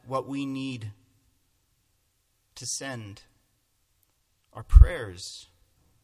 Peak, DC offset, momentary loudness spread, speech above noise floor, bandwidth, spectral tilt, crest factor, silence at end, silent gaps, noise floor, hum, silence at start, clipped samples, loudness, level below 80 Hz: 0 dBFS; under 0.1%; 26 LU; 49 dB; 11.5 kHz; -5.5 dB/octave; 26 dB; 0.65 s; none; -72 dBFS; none; 0.1 s; under 0.1%; -26 LUFS; -28 dBFS